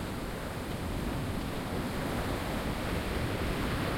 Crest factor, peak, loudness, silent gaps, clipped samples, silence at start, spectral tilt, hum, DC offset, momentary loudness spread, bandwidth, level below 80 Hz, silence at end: 14 dB; -20 dBFS; -35 LUFS; none; under 0.1%; 0 s; -5.5 dB/octave; none; under 0.1%; 4 LU; 16.5 kHz; -42 dBFS; 0 s